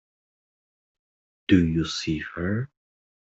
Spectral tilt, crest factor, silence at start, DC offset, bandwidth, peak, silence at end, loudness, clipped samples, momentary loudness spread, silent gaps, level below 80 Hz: -6 dB/octave; 22 dB; 1.5 s; under 0.1%; 8 kHz; -4 dBFS; 0.6 s; -25 LUFS; under 0.1%; 14 LU; none; -52 dBFS